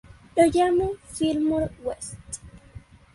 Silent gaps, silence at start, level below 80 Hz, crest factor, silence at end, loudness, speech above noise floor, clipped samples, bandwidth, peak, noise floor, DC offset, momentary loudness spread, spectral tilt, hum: none; 0.35 s; -48 dBFS; 20 dB; 0.35 s; -24 LUFS; 23 dB; under 0.1%; 11.5 kHz; -6 dBFS; -47 dBFS; under 0.1%; 18 LU; -5 dB/octave; none